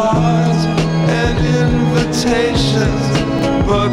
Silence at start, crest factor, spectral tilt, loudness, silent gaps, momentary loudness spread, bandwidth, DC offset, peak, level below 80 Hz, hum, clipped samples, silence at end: 0 s; 12 dB; -6 dB/octave; -14 LUFS; none; 2 LU; 12.5 kHz; under 0.1%; 0 dBFS; -26 dBFS; none; under 0.1%; 0 s